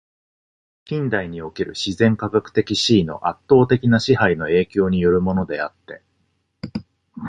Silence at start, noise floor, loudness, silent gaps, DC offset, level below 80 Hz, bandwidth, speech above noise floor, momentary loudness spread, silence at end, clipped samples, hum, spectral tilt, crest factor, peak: 0.9 s; -68 dBFS; -19 LUFS; none; under 0.1%; -46 dBFS; 10 kHz; 49 dB; 14 LU; 0 s; under 0.1%; none; -6 dB/octave; 18 dB; -2 dBFS